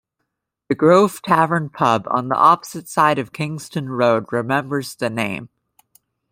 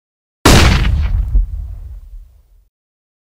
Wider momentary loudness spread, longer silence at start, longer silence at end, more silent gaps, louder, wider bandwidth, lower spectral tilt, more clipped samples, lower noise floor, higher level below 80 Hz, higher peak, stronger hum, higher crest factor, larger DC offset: second, 12 LU vs 22 LU; first, 0.7 s vs 0.45 s; second, 0.85 s vs 1.05 s; neither; second, -18 LUFS vs -13 LUFS; about the same, 16.5 kHz vs 16.5 kHz; first, -6 dB/octave vs -4.5 dB/octave; second, under 0.1% vs 0.1%; first, -76 dBFS vs -42 dBFS; second, -62 dBFS vs -18 dBFS; about the same, -2 dBFS vs 0 dBFS; neither; about the same, 18 dB vs 14 dB; neither